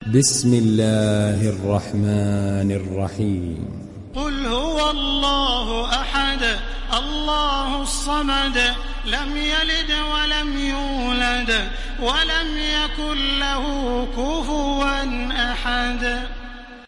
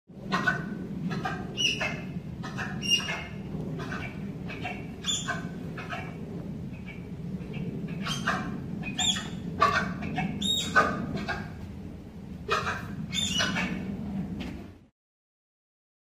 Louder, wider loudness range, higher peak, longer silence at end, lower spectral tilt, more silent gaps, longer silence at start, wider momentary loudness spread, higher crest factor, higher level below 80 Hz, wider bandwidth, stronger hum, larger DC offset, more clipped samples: first, -21 LUFS vs -30 LUFS; second, 3 LU vs 7 LU; about the same, -4 dBFS vs -6 dBFS; second, 0 s vs 1.25 s; about the same, -4 dB/octave vs -3.5 dB/octave; neither; about the same, 0 s vs 0.1 s; second, 7 LU vs 14 LU; second, 16 dB vs 26 dB; first, -28 dBFS vs -50 dBFS; second, 11.5 kHz vs 15.5 kHz; neither; neither; neither